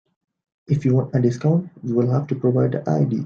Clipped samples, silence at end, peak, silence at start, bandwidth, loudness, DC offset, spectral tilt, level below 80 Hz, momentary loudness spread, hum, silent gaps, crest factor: under 0.1%; 0 s; -6 dBFS; 0.7 s; 7 kHz; -21 LUFS; under 0.1%; -9.5 dB/octave; -58 dBFS; 4 LU; none; none; 14 dB